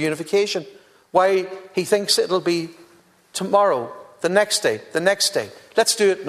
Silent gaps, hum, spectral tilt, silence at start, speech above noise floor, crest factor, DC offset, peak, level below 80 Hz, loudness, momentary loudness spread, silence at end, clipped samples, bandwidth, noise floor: none; none; -2.5 dB/octave; 0 s; 34 dB; 20 dB; under 0.1%; -2 dBFS; -70 dBFS; -20 LUFS; 10 LU; 0 s; under 0.1%; 14 kHz; -54 dBFS